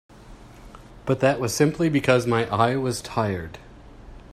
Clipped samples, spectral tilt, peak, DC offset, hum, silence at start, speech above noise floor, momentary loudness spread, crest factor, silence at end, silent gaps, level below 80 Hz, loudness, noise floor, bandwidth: under 0.1%; -5.5 dB/octave; -4 dBFS; under 0.1%; none; 0.2 s; 23 dB; 13 LU; 20 dB; 0.1 s; none; -48 dBFS; -22 LUFS; -45 dBFS; 15 kHz